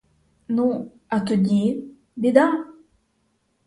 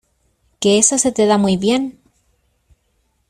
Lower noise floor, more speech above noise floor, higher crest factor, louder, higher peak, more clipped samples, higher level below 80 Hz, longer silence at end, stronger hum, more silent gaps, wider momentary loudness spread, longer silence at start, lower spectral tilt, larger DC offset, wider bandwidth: first, -68 dBFS vs -64 dBFS; about the same, 49 dB vs 50 dB; about the same, 22 dB vs 18 dB; second, -22 LUFS vs -15 LUFS; about the same, -2 dBFS vs 0 dBFS; neither; second, -62 dBFS vs -54 dBFS; second, 0.95 s vs 1.4 s; neither; neither; first, 14 LU vs 8 LU; about the same, 0.5 s vs 0.6 s; first, -7.5 dB/octave vs -3.5 dB/octave; neither; second, 11 kHz vs 13 kHz